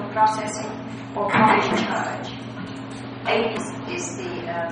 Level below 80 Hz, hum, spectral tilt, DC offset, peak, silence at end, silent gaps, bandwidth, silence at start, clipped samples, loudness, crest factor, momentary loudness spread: -58 dBFS; none; -4.5 dB/octave; under 0.1%; -4 dBFS; 0 s; none; 10 kHz; 0 s; under 0.1%; -24 LUFS; 20 dB; 16 LU